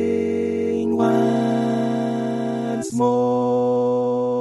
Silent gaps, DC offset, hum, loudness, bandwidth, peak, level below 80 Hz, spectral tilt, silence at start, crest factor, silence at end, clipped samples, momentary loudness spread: none; under 0.1%; none; -21 LUFS; 12 kHz; -6 dBFS; -64 dBFS; -7 dB/octave; 0 s; 14 dB; 0 s; under 0.1%; 5 LU